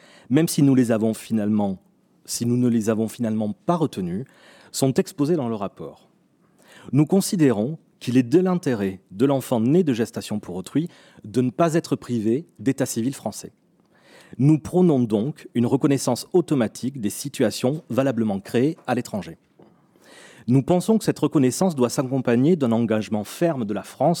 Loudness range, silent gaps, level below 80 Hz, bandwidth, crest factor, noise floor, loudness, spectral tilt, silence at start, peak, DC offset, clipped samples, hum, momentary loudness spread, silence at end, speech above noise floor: 4 LU; none; -64 dBFS; 18 kHz; 18 dB; -60 dBFS; -22 LUFS; -6.5 dB/octave; 0.3 s; -4 dBFS; under 0.1%; under 0.1%; none; 11 LU; 0 s; 39 dB